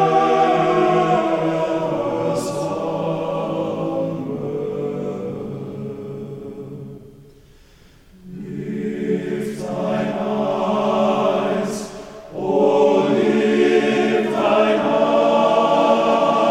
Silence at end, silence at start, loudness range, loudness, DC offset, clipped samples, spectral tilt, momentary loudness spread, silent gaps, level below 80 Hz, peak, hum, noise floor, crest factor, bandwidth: 0 s; 0 s; 14 LU; -19 LUFS; under 0.1%; under 0.1%; -6 dB/octave; 16 LU; none; -52 dBFS; -4 dBFS; none; -48 dBFS; 16 dB; 14.5 kHz